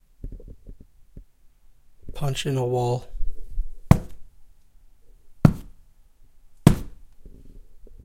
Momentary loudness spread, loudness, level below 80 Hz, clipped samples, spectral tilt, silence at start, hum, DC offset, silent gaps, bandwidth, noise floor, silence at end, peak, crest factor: 24 LU; -23 LUFS; -34 dBFS; under 0.1%; -7 dB/octave; 0.25 s; none; under 0.1%; none; 16.5 kHz; -51 dBFS; 0.1 s; 0 dBFS; 26 dB